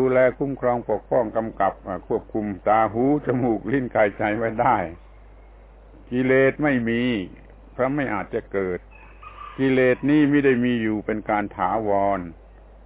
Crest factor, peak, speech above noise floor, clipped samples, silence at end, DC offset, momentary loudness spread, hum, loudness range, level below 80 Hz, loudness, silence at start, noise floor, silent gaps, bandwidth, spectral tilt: 16 dB; -6 dBFS; 25 dB; under 0.1%; 0.5 s; under 0.1%; 11 LU; none; 3 LU; -46 dBFS; -22 LUFS; 0 s; -46 dBFS; none; 4 kHz; -10.5 dB/octave